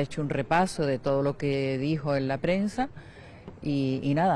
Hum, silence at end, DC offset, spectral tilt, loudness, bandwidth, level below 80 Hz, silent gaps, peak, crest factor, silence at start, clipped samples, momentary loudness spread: none; 0 s; under 0.1%; -7 dB/octave; -28 LUFS; 12 kHz; -52 dBFS; none; -12 dBFS; 16 dB; 0 s; under 0.1%; 13 LU